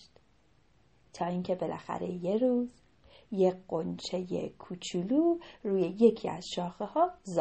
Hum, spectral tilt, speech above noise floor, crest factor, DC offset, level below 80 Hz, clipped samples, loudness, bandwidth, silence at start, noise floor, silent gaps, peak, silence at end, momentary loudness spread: none; -6.5 dB/octave; 37 dB; 22 dB; under 0.1%; -68 dBFS; under 0.1%; -32 LUFS; 8.4 kHz; 1.15 s; -67 dBFS; none; -10 dBFS; 0 s; 11 LU